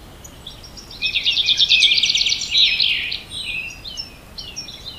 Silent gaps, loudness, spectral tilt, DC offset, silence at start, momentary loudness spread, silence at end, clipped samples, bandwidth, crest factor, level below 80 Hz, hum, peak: none; -15 LUFS; 1 dB/octave; under 0.1%; 0 s; 24 LU; 0 s; under 0.1%; 16 kHz; 18 dB; -46 dBFS; none; -2 dBFS